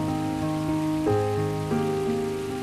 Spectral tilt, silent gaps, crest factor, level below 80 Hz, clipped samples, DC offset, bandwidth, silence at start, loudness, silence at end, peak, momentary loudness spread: -7 dB/octave; none; 14 dB; -48 dBFS; under 0.1%; under 0.1%; 15 kHz; 0 s; -26 LUFS; 0 s; -12 dBFS; 3 LU